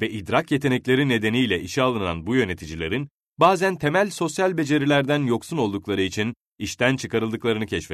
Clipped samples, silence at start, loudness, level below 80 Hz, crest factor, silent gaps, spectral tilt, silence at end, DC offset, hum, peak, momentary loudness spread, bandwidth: under 0.1%; 0 s; -22 LUFS; -52 dBFS; 18 dB; 3.11-3.18 s, 6.41-6.52 s; -5.5 dB/octave; 0 s; under 0.1%; none; -4 dBFS; 8 LU; 13.5 kHz